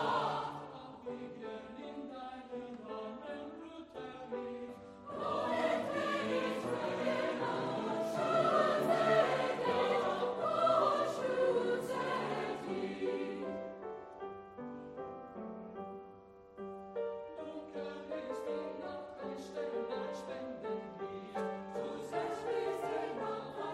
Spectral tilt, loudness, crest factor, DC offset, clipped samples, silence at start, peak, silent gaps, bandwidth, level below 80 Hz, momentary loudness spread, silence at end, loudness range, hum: -5.5 dB/octave; -37 LUFS; 20 dB; under 0.1%; under 0.1%; 0 s; -18 dBFS; none; 13 kHz; -74 dBFS; 16 LU; 0 s; 14 LU; none